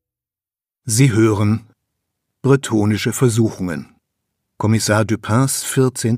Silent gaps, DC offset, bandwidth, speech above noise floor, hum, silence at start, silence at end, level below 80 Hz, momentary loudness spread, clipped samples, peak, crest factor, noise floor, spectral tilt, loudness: none; under 0.1%; 15.5 kHz; over 74 dB; none; 0.85 s; 0 s; -56 dBFS; 9 LU; under 0.1%; 0 dBFS; 18 dB; under -90 dBFS; -5.5 dB/octave; -17 LUFS